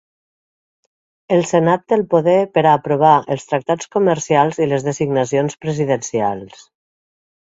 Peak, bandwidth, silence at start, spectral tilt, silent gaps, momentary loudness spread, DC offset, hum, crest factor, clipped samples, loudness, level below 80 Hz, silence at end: 0 dBFS; 8 kHz; 1.3 s; -6 dB/octave; none; 7 LU; under 0.1%; none; 18 dB; under 0.1%; -16 LUFS; -58 dBFS; 1 s